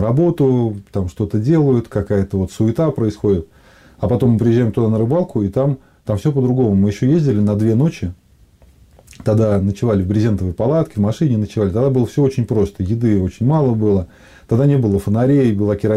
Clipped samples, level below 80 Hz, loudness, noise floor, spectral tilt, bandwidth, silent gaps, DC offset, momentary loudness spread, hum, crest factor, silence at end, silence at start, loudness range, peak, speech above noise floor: under 0.1%; -42 dBFS; -17 LUFS; -49 dBFS; -9 dB/octave; 12 kHz; none; under 0.1%; 6 LU; none; 12 dB; 0 s; 0 s; 2 LU; -4 dBFS; 33 dB